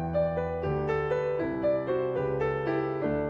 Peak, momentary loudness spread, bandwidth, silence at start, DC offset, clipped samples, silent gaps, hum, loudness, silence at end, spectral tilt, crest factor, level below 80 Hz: -16 dBFS; 2 LU; 7 kHz; 0 s; under 0.1%; under 0.1%; none; none; -29 LUFS; 0 s; -9 dB/octave; 12 dB; -50 dBFS